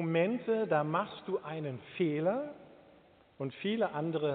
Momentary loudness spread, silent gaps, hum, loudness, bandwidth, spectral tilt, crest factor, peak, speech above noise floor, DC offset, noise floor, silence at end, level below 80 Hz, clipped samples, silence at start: 11 LU; none; none; -34 LUFS; 4.5 kHz; -5.5 dB/octave; 18 dB; -16 dBFS; 29 dB; under 0.1%; -62 dBFS; 0 s; -78 dBFS; under 0.1%; 0 s